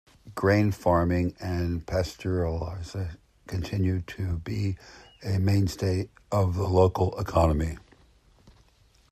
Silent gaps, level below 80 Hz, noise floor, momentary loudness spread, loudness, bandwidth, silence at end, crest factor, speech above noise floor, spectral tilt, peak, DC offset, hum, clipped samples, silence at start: none; -44 dBFS; -61 dBFS; 12 LU; -27 LUFS; 14 kHz; 1.35 s; 20 dB; 35 dB; -7.5 dB/octave; -8 dBFS; under 0.1%; none; under 0.1%; 0.25 s